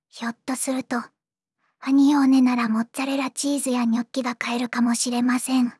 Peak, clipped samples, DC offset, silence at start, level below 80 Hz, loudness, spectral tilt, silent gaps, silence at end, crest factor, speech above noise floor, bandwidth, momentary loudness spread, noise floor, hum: -10 dBFS; under 0.1%; under 0.1%; 0.15 s; -84 dBFS; -22 LUFS; -3 dB/octave; none; 0.05 s; 12 dB; 60 dB; 12 kHz; 11 LU; -82 dBFS; none